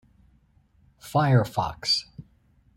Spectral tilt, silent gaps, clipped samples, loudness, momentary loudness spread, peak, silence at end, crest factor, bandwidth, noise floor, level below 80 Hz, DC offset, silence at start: -5.5 dB/octave; none; under 0.1%; -24 LUFS; 19 LU; -6 dBFS; 0.55 s; 20 dB; 15.5 kHz; -61 dBFS; -56 dBFS; under 0.1%; 1.05 s